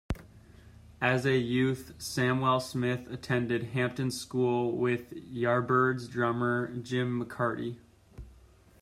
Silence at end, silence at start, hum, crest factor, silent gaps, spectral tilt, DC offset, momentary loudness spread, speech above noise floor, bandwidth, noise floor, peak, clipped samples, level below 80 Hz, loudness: 0.5 s; 0.1 s; none; 18 dB; none; -6 dB/octave; under 0.1%; 10 LU; 28 dB; 15.5 kHz; -58 dBFS; -12 dBFS; under 0.1%; -54 dBFS; -30 LUFS